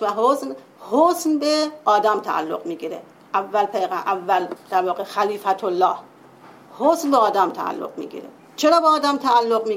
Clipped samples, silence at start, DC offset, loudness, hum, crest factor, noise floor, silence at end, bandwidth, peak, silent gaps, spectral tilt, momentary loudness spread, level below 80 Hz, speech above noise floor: under 0.1%; 0 s; under 0.1%; -20 LUFS; none; 16 dB; -46 dBFS; 0 s; 16.5 kHz; -4 dBFS; none; -3.5 dB/octave; 14 LU; -72 dBFS; 26 dB